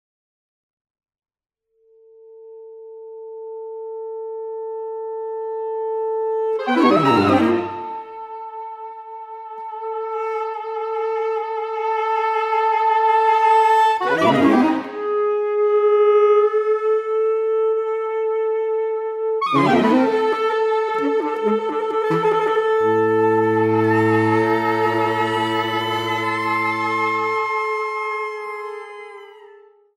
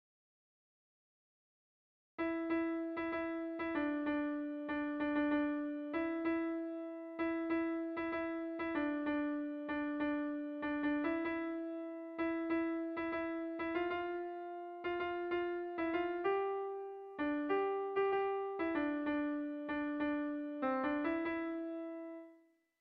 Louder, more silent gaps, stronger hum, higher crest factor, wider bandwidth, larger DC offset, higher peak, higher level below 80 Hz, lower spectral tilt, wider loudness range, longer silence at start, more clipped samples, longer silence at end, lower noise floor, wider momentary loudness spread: first, -19 LUFS vs -39 LUFS; neither; neither; about the same, 16 dB vs 16 dB; first, 10.5 kHz vs 5 kHz; neither; first, -4 dBFS vs -24 dBFS; about the same, -68 dBFS vs -70 dBFS; first, -6.5 dB/octave vs -3 dB/octave; first, 12 LU vs 2 LU; about the same, 2.25 s vs 2.2 s; neither; about the same, 0.55 s vs 0.45 s; second, -57 dBFS vs -68 dBFS; first, 17 LU vs 7 LU